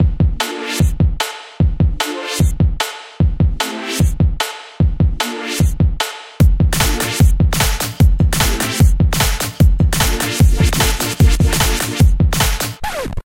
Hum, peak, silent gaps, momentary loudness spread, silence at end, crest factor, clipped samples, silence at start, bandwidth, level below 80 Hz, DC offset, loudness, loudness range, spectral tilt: none; 0 dBFS; none; 8 LU; 0.15 s; 14 dB; under 0.1%; 0 s; 17 kHz; -18 dBFS; under 0.1%; -16 LUFS; 3 LU; -4.5 dB/octave